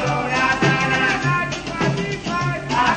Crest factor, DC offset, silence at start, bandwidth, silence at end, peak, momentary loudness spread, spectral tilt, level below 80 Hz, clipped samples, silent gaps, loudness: 16 dB; under 0.1%; 0 s; 9.4 kHz; 0 s; -4 dBFS; 6 LU; -5 dB/octave; -42 dBFS; under 0.1%; none; -19 LUFS